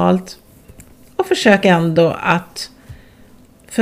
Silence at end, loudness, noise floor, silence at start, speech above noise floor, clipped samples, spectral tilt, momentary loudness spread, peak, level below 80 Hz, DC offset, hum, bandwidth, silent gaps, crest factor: 0 s; -15 LUFS; -45 dBFS; 0 s; 31 dB; under 0.1%; -5.5 dB/octave; 17 LU; 0 dBFS; -50 dBFS; under 0.1%; none; 16 kHz; none; 18 dB